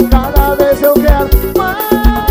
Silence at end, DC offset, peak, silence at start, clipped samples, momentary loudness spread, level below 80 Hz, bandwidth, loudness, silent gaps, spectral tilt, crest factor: 0 s; under 0.1%; 0 dBFS; 0 s; 1%; 4 LU; -14 dBFS; 16.5 kHz; -11 LUFS; none; -6.5 dB/octave; 10 dB